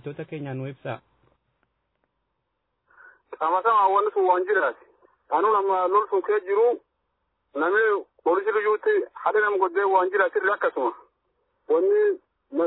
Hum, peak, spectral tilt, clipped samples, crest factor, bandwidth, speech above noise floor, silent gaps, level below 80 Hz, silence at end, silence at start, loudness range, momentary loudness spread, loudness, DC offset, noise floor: none; -8 dBFS; -9.5 dB/octave; under 0.1%; 16 dB; 4.1 kHz; 55 dB; none; -78 dBFS; 0 s; 0.05 s; 5 LU; 13 LU; -23 LUFS; under 0.1%; -77 dBFS